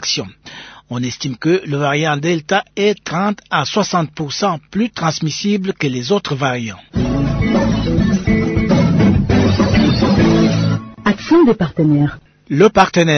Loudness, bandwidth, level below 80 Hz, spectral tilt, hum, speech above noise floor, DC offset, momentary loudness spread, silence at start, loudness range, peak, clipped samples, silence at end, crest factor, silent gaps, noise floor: -15 LUFS; 6.6 kHz; -32 dBFS; -6 dB/octave; none; 21 dB; under 0.1%; 9 LU; 0 s; 5 LU; 0 dBFS; under 0.1%; 0 s; 14 dB; none; -36 dBFS